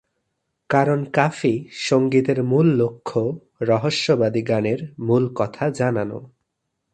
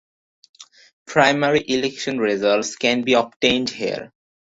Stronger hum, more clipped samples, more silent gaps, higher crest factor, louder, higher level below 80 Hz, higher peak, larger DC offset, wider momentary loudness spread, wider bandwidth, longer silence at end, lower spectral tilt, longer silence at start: neither; neither; second, none vs 0.93-1.06 s, 3.36-3.40 s; about the same, 20 dB vs 20 dB; about the same, -21 LUFS vs -19 LUFS; about the same, -60 dBFS vs -58 dBFS; about the same, 0 dBFS vs -2 dBFS; neither; about the same, 8 LU vs 8 LU; first, 9.8 kHz vs 8 kHz; first, 0.65 s vs 0.4 s; first, -6.5 dB/octave vs -3.5 dB/octave; about the same, 0.7 s vs 0.6 s